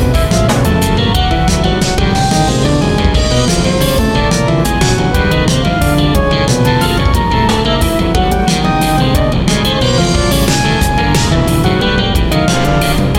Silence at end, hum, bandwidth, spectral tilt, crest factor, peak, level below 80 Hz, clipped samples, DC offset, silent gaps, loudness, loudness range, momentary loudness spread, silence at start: 0 s; none; 17 kHz; -5 dB/octave; 10 dB; 0 dBFS; -18 dBFS; under 0.1%; under 0.1%; none; -12 LUFS; 0 LU; 1 LU; 0 s